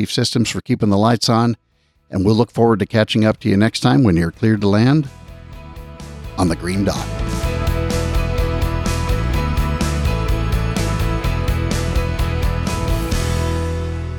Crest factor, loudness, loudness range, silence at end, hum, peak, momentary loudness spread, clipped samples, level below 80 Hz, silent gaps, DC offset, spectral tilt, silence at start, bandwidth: 16 dB; -18 LUFS; 5 LU; 0 s; none; -2 dBFS; 9 LU; under 0.1%; -26 dBFS; none; under 0.1%; -6 dB/octave; 0 s; 19.5 kHz